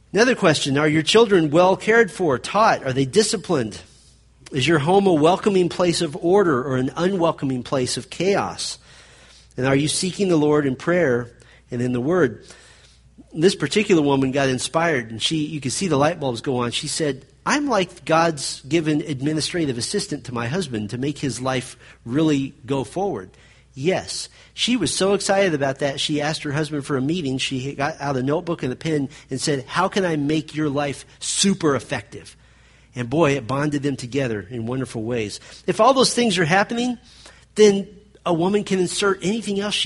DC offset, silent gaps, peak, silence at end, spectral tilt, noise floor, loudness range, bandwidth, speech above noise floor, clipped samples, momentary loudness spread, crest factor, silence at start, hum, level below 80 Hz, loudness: under 0.1%; none; -2 dBFS; 0 s; -4.5 dB/octave; -52 dBFS; 5 LU; 11.5 kHz; 31 dB; under 0.1%; 11 LU; 18 dB; 0.15 s; none; -52 dBFS; -21 LUFS